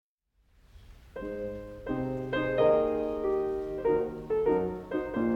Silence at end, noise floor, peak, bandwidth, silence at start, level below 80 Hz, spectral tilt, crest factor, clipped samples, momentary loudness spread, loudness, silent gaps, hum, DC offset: 0 s; -70 dBFS; -14 dBFS; 6.8 kHz; 0.75 s; -52 dBFS; -8 dB/octave; 18 dB; under 0.1%; 14 LU; -30 LUFS; none; none; under 0.1%